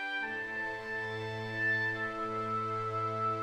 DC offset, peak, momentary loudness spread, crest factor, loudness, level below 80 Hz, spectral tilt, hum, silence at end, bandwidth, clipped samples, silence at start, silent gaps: under 0.1%; -22 dBFS; 6 LU; 12 dB; -34 LUFS; -66 dBFS; -5.5 dB/octave; none; 0 s; 12 kHz; under 0.1%; 0 s; none